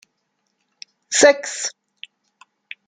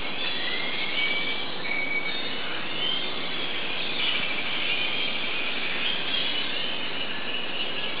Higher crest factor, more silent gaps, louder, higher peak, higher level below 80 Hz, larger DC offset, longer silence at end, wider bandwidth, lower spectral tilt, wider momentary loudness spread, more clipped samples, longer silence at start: about the same, 20 dB vs 16 dB; neither; first, -17 LUFS vs -26 LUFS; first, -2 dBFS vs -12 dBFS; second, -72 dBFS vs -64 dBFS; second, under 0.1% vs 4%; first, 1.2 s vs 0 s; first, 9.6 kHz vs 4 kHz; second, 0 dB/octave vs -6 dB/octave; first, 26 LU vs 5 LU; neither; first, 1.1 s vs 0 s